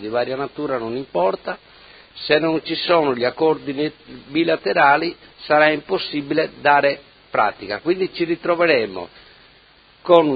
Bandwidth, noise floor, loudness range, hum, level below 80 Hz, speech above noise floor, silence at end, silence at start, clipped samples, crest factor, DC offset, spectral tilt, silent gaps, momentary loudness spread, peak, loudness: 5 kHz; -51 dBFS; 3 LU; none; -58 dBFS; 32 dB; 0 s; 0 s; under 0.1%; 20 dB; under 0.1%; -8 dB/octave; none; 12 LU; 0 dBFS; -19 LUFS